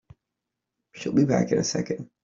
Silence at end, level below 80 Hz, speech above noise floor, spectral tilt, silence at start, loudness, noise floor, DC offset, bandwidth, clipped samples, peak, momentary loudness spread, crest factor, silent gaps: 0.2 s; -60 dBFS; 60 dB; -5.5 dB/octave; 0.95 s; -25 LUFS; -84 dBFS; under 0.1%; 7.8 kHz; under 0.1%; -8 dBFS; 10 LU; 20 dB; none